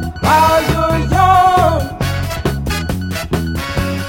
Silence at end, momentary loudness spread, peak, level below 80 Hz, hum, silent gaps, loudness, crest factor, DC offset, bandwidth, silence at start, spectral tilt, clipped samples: 0 s; 10 LU; 0 dBFS; -26 dBFS; none; none; -14 LUFS; 14 dB; under 0.1%; 17 kHz; 0 s; -5.5 dB/octave; under 0.1%